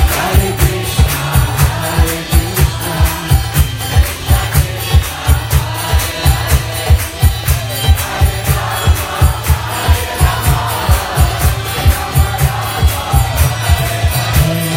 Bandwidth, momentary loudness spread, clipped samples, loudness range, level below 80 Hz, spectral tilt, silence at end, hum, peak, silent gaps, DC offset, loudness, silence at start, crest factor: 16.5 kHz; 3 LU; under 0.1%; 0 LU; -16 dBFS; -4.5 dB/octave; 0 s; none; 0 dBFS; none; under 0.1%; -14 LUFS; 0 s; 12 dB